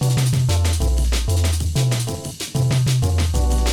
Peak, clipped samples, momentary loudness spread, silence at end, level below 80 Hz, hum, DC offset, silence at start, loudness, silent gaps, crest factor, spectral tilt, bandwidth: -8 dBFS; under 0.1%; 5 LU; 0 s; -24 dBFS; none; 0.3%; 0 s; -20 LUFS; none; 10 dB; -5 dB/octave; 18 kHz